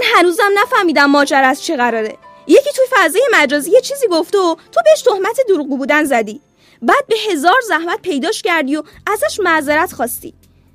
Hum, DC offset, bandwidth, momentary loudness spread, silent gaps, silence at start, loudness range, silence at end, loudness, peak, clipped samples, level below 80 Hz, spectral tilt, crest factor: none; under 0.1%; 15.5 kHz; 9 LU; none; 0 s; 3 LU; 0.45 s; -13 LUFS; 0 dBFS; under 0.1%; -56 dBFS; -2 dB/octave; 14 dB